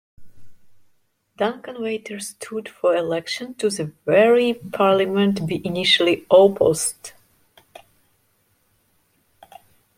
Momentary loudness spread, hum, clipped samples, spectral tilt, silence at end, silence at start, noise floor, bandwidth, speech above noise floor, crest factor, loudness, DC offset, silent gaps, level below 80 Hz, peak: 15 LU; none; under 0.1%; -4 dB/octave; 2.9 s; 0.2 s; -65 dBFS; 16.5 kHz; 45 dB; 20 dB; -20 LUFS; under 0.1%; none; -60 dBFS; -2 dBFS